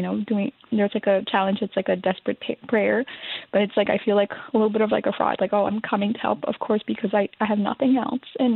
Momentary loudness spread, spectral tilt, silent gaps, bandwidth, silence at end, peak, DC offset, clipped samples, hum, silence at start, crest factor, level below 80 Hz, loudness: 5 LU; -10 dB/octave; none; 4.3 kHz; 0 s; -6 dBFS; under 0.1%; under 0.1%; none; 0 s; 16 dB; -66 dBFS; -23 LUFS